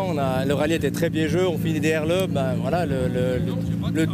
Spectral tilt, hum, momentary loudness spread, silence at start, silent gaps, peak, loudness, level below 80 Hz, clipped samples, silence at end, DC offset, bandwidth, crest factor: -6.5 dB/octave; none; 2 LU; 0 s; none; -10 dBFS; -23 LUFS; -44 dBFS; under 0.1%; 0 s; under 0.1%; 15.5 kHz; 12 dB